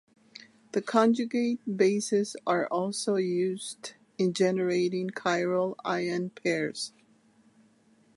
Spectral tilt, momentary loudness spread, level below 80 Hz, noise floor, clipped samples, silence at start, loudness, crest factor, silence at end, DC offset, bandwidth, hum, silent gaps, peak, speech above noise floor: -5 dB/octave; 9 LU; -80 dBFS; -63 dBFS; under 0.1%; 0.75 s; -28 LUFS; 22 dB; 1.3 s; under 0.1%; 11.5 kHz; none; none; -8 dBFS; 35 dB